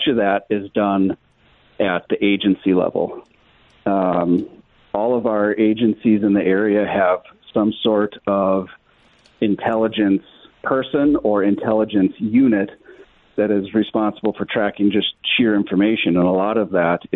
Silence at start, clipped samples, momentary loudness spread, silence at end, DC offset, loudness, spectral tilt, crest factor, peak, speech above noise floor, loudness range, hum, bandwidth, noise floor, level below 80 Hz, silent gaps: 0 s; under 0.1%; 7 LU; 0 s; under 0.1%; -18 LUFS; -9.5 dB/octave; 12 dB; -6 dBFS; 37 dB; 3 LU; none; 4.1 kHz; -55 dBFS; -54 dBFS; none